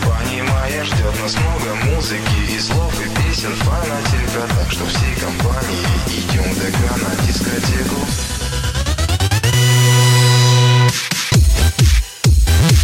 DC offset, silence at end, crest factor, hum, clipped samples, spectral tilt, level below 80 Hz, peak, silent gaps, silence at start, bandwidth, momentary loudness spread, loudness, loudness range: under 0.1%; 0 s; 12 dB; none; under 0.1%; -4.5 dB/octave; -20 dBFS; -4 dBFS; none; 0 s; 16.5 kHz; 8 LU; -16 LUFS; 5 LU